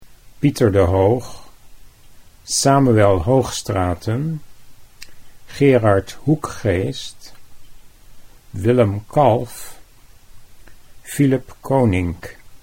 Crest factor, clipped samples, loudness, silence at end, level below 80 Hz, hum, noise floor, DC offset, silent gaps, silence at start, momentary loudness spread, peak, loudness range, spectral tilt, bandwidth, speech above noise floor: 18 dB; under 0.1%; -18 LUFS; 0.05 s; -42 dBFS; none; -44 dBFS; under 0.1%; none; 0 s; 18 LU; 0 dBFS; 4 LU; -6 dB/octave; 16.5 kHz; 27 dB